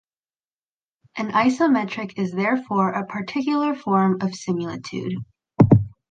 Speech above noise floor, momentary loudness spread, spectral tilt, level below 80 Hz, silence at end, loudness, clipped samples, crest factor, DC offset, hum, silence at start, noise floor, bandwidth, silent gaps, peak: over 68 dB; 13 LU; -7.5 dB/octave; -48 dBFS; 0.2 s; -22 LUFS; under 0.1%; 20 dB; under 0.1%; none; 1.15 s; under -90 dBFS; 9 kHz; none; -2 dBFS